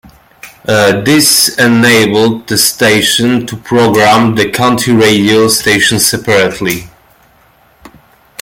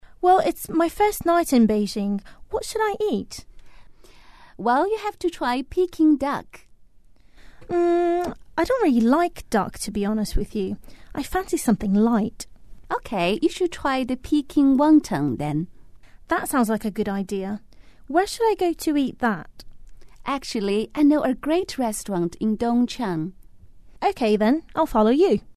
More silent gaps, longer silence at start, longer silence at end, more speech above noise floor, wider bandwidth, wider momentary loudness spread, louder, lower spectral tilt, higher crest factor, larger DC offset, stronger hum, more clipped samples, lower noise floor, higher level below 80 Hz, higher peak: neither; first, 0.45 s vs 0.2 s; first, 0.55 s vs 0.05 s; first, 38 dB vs 32 dB; first, 17.5 kHz vs 13.5 kHz; second, 7 LU vs 11 LU; first, -8 LUFS vs -22 LUFS; second, -3.5 dB/octave vs -5.5 dB/octave; second, 10 dB vs 16 dB; second, under 0.1% vs 0.4%; neither; neither; second, -47 dBFS vs -54 dBFS; about the same, -44 dBFS vs -42 dBFS; first, 0 dBFS vs -6 dBFS